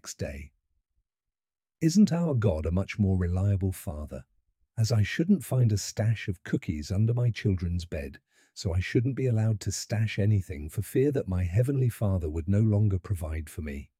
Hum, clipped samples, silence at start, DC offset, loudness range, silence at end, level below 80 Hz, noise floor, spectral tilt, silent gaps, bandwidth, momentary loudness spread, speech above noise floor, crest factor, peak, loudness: none; under 0.1%; 0.05 s; under 0.1%; 2 LU; 0.15 s; -44 dBFS; under -90 dBFS; -7 dB/octave; none; 15.5 kHz; 12 LU; over 63 dB; 16 dB; -12 dBFS; -28 LUFS